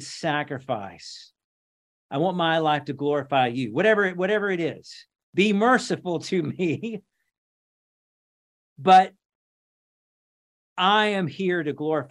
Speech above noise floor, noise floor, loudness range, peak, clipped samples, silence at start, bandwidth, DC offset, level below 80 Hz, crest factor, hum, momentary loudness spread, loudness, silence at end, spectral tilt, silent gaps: over 67 dB; under -90 dBFS; 4 LU; -4 dBFS; under 0.1%; 0 s; 11 kHz; under 0.1%; -74 dBFS; 22 dB; none; 14 LU; -23 LUFS; 0.05 s; -5.5 dB/octave; 1.44-2.09 s, 5.23-5.33 s, 7.38-8.76 s, 9.35-10.76 s